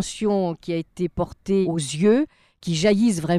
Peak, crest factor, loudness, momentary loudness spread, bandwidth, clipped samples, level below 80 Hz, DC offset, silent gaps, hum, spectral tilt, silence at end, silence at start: -8 dBFS; 14 dB; -22 LUFS; 10 LU; 13 kHz; under 0.1%; -50 dBFS; under 0.1%; none; none; -5.5 dB/octave; 0 s; 0 s